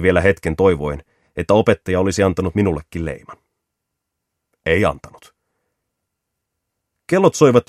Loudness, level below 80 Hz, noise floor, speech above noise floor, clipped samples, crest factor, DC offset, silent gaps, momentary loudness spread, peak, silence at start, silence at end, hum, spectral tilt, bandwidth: -17 LUFS; -40 dBFS; -78 dBFS; 62 dB; under 0.1%; 18 dB; under 0.1%; none; 14 LU; 0 dBFS; 0 s; 0.05 s; none; -6 dB/octave; 13.5 kHz